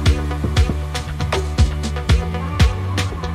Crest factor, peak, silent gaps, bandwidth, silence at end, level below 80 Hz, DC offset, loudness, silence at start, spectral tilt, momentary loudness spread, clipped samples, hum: 16 dB; -2 dBFS; none; 13 kHz; 0 s; -20 dBFS; under 0.1%; -20 LUFS; 0 s; -5.5 dB/octave; 6 LU; under 0.1%; none